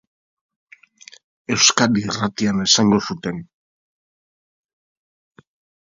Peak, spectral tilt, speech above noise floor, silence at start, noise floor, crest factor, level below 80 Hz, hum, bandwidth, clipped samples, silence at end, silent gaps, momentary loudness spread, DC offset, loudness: 0 dBFS; -3 dB/octave; 29 dB; 1.5 s; -47 dBFS; 22 dB; -56 dBFS; none; 7.6 kHz; under 0.1%; 2.4 s; none; 15 LU; under 0.1%; -17 LUFS